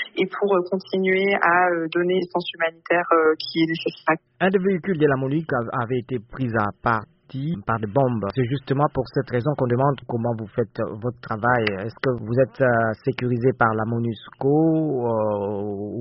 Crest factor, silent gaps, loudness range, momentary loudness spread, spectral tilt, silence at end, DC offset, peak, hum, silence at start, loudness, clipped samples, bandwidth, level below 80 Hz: 18 dB; none; 3 LU; 8 LU; -5.5 dB/octave; 0 s; under 0.1%; -4 dBFS; none; 0 s; -22 LUFS; under 0.1%; 5.8 kHz; -54 dBFS